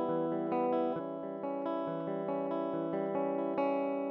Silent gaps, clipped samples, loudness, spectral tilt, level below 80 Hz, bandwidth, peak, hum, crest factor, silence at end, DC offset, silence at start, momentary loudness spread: none; under 0.1%; -35 LUFS; -6.5 dB/octave; -82 dBFS; 5.6 kHz; -20 dBFS; none; 14 dB; 0 s; under 0.1%; 0 s; 5 LU